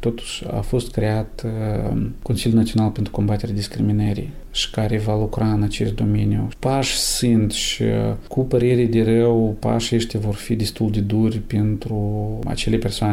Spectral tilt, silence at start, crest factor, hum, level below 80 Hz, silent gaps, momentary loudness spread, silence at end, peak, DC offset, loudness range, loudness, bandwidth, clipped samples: -6 dB/octave; 0 s; 12 dB; none; -34 dBFS; none; 7 LU; 0 s; -8 dBFS; under 0.1%; 3 LU; -21 LUFS; 15.5 kHz; under 0.1%